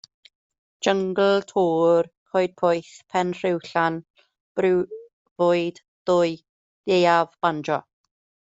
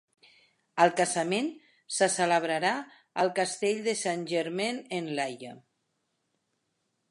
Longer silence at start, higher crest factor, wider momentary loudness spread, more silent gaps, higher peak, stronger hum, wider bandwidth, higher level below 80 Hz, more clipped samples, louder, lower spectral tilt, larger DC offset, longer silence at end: about the same, 0.8 s vs 0.75 s; about the same, 20 dB vs 22 dB; about the same, 12 LU vs 11 LU; first, 2.17-2.26 s, 4.10-4.14 s, 4.40-4.55 s, 5.13-5.25 s, 5.31-5.36 s, 5.88-6.06 s, 6.49-6.84 s vs none; first, -4 dBFS vs -8 dBFS; neither; second, 8 kHz vs 11.5 kHz; first, -68 dBFS vs -84 dBFS; neither; first, -23 LUFS vs -29 LUFS; first, -5.5 dB/octave vs -3 dB/octave; neither; second, 0.6 s vs 1.5 s